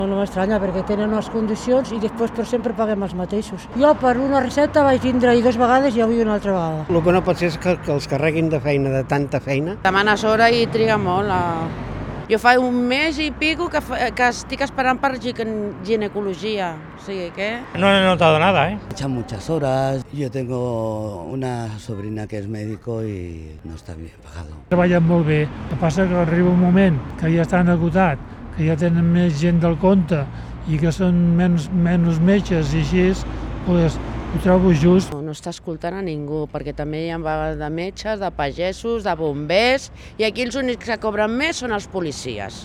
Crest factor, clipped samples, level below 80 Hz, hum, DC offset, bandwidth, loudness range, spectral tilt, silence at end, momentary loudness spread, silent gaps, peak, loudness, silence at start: 18 dB; under 0.1%; -38 dBFS; none; under 0.1%; 11.5 kHz; 7 LU; -6.5 dB/octave; 0 s; 13 LU; none; 0 dBFS; -19 LUFS; 0 s